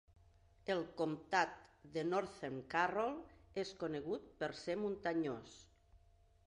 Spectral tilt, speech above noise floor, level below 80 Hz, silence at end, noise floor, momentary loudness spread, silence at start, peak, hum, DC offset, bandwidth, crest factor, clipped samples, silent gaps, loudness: -5 dB/octave; 29 dB; -70 dBFS; 0.5 s; -69 dBFS; 11 LU; 0.65 s; -20 dBFS; none; under 0.1%; 11 kHz; 22 dB; under 0.1%; none; -41 LUFS